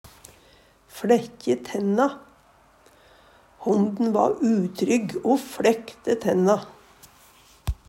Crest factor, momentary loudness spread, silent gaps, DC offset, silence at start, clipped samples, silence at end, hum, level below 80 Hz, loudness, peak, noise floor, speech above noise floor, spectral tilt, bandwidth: 20 dB; 11 LU; none; under 0.1%; 0.95 s; under 0.1%; 0.15 s; none; -48 dBFS; -23 LUFS; -6 dBFS; -57 dBFS; 34 dB; -6 dB/octave; 16 kHz